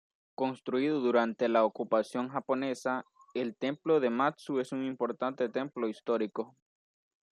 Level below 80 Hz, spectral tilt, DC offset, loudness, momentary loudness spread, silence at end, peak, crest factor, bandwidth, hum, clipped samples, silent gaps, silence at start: -84 dBFS; -6 dB/octave; under 0.1%; -32 LUFS; 9 LU; 0.85 s; -14 dBFS; 18 dB; 12 kHz; none; under 0.1%; none; 0.4 s